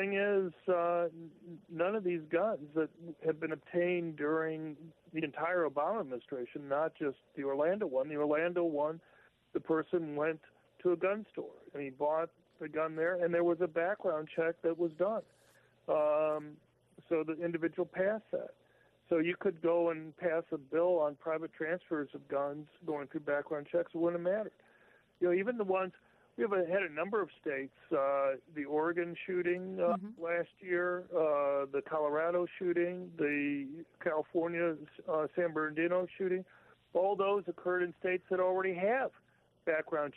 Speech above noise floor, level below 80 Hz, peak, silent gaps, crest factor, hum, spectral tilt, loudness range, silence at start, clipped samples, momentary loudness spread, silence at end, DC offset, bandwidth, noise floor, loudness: 33 dB; -80 dBFS; -20 dBFS; none; 14 dB; none; -9 dB/octave; 2 LU; 0 s; under 0.1%; 9 LU; 0.05 s; under 0.1%; 4.1 kHz; -68 dBFS; -35 LUFS